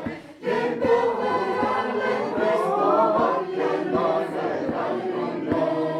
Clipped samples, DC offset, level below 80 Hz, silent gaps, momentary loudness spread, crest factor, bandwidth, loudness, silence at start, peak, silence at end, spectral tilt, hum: under 0.1%; under 0.1%; -58 dBFS; none; 6 LU; 14 dB; 12 kHz; -23 LUFS; 0 s; -8 dBFS; 0 s; -6.5 dB/octave; none